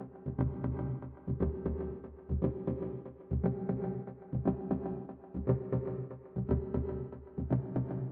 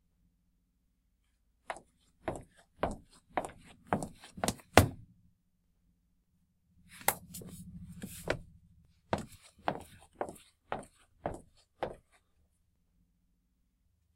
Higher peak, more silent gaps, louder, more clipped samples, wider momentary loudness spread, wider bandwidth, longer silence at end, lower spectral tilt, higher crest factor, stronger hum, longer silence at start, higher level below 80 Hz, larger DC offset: second, -16 dBFS vs 0 dBFS; neither; about the same, -37 LUFS vs -37 LUFS; neither; second, 9 LU vs 17 LU; second, 2.8 kHz vs 16 kHz; second, 0 s vs 2.2 s; first, -12 dB/octave vs -4.5 dB/octave; second, 20 dB vs 40 dB; neither; second, 0 s vs 1.7 s; first, -44 dBFS vs -54 dBFS; neither